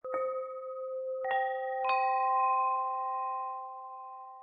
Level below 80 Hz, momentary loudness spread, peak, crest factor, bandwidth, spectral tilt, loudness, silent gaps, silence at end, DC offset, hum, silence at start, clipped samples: under -90 dBFS; 15 LU; -18 dBFS; 14 dB; 4.8 kHz; -4 dB/octave; -32 LUFS; none; 0 s; under 0.1%; none; 0.05 s; under 0.1%